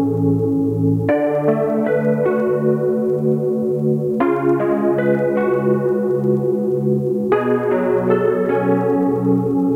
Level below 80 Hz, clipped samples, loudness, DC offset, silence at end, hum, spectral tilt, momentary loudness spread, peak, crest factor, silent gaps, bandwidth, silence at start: -54 dBFS; under 0.1%; -17 LUFS; under 0.1%; 0 s; none; -10 dB/octave; 2 LU; -4 dBFS; 14 dB; none; 4 kHz; 0 s